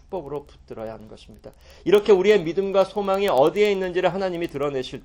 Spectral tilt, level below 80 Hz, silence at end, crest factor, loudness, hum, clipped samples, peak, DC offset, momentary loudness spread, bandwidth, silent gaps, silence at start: -6 dB/octave; -52 dBFS; 0.05 s; 18 dB; -21 LUFS; none; under 0.1%; -4 dBFS; under 0.1%; 18 LU; 17 kHz; none; 0.1 s